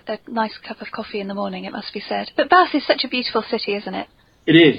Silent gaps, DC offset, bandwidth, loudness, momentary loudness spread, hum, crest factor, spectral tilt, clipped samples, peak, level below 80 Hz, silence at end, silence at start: none; under 0.1%; 5.2 kHz; -21 LUFS; 15 LU; none; 20 dB; -8 dB/octave; under 0.1%; 0 dBFS; -60 dBFS; 0 s; 0.05 s